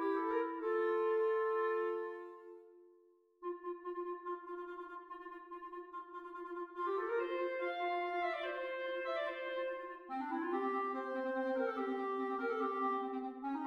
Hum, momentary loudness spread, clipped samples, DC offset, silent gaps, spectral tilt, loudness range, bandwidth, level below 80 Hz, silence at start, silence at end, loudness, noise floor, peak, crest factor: none; 14 LU; under 0.1%; under 0.1%; none; -4.5 dB/octave; 9 LU; 6.4 kHz; -84 dBFS; 0 s; 0 s; -39 LUFS; -69 dBFS; -24 dBFS; 14 dB